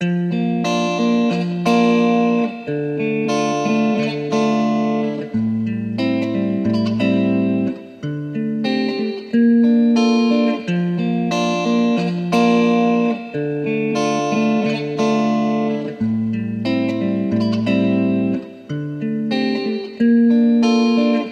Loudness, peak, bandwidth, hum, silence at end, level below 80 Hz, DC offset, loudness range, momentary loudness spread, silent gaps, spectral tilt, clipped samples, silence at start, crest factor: -18 LUFS; -4 dBFS; 8.6 kHz; none; 0 s; -60 dBFS; under 0.1%; 3 LU; 8 LU; none; -6.5 dB/octave; under 0.1%; 0 s; 14 dB